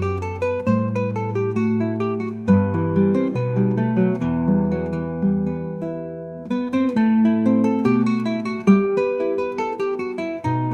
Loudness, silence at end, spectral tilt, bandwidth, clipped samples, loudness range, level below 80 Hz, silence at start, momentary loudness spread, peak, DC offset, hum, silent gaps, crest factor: -21 LUFS; 0 s; -9 dB/octave; 7 kHz; under 0.1%; 3 LU; -54 dBFS; 0 s; 8 LU; -4 dBFS; under 0.1%; none; none; 18 dB